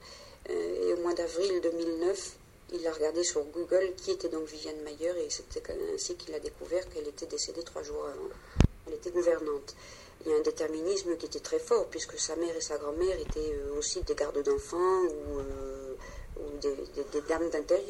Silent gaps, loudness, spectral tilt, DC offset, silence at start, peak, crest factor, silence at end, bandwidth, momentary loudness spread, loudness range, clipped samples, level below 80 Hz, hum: none; -33 LUFS; -4.5 dB/octave; under 0.1%; 0 s; -8 dBFS; 24 dB; 0 s; 15.5 kHz; 11 LU; 4 LU; under 0.1%; -46 dBFS; none